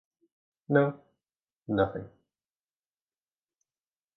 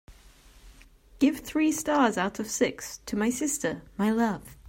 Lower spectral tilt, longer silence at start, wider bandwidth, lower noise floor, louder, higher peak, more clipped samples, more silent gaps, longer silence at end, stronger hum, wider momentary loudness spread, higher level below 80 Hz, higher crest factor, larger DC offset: first, -10 dB/octave vs -4 dB/octave; first, 0.7 s vs 0.1 s; second, 4.1 kHz vs 16.5 kHz; first, under -90 dBFS vs -54 dBFS; about the same, -29 LUFS vs -27 LUFS; about the same, -10 dBFS vs -10 dBFS; neither; first, 1.57-1.61 s vs none; first, 2.1 s vs 0 s; neither; first, 22 LU vs 6 LU; second, -62 dBFS vs -54 dBFS; first, 24 dB vs 18 dB; neither